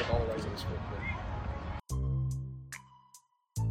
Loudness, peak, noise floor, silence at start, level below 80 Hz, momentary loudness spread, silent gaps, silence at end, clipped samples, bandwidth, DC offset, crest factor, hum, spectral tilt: -37 LUFS; -18 dBFS; -62 dBFS; 0 s; -42 dBFS; 14 LU; none; 0 s; under 0.1%; 15.5 kHz; under 0.1%; 18 dB; none; -6 dB/octave